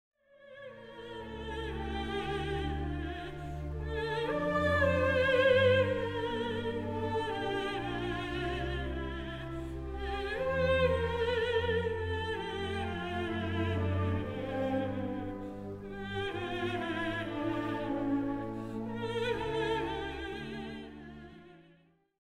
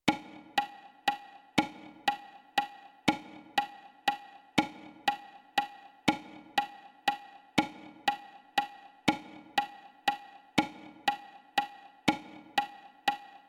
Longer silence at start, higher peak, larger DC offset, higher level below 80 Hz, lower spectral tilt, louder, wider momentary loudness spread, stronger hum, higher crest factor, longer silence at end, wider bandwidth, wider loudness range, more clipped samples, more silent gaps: first, 0.4 s vs 0.05 s; second, -16 dBFS vs -10 dBFS; neither; first, -46 dBFS vs -68 dBFS; first, -6.5 dB/octave vs -3.5 dB/octave; about the same, -34 LUFS vs -34 LUFS; first, 14 LU vs 11 LU; neither; second, 18 dB vs 26 dB; first, 0.6 s vs 0.1 s; second, 13 kHz vs 18.5 kHz; first, 8 LU vs 0 LU; neither; neither